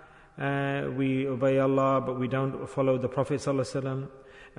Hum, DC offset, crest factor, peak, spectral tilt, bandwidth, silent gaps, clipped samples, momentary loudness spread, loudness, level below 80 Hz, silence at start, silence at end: none; under 0.1%; 14 dB; -14 dBFS; -7.5 dB/octave; 11 kHz; none; under 0.1%; 8 LU; -28 LUFS; -60 dBFS; 0 s; 0.1 s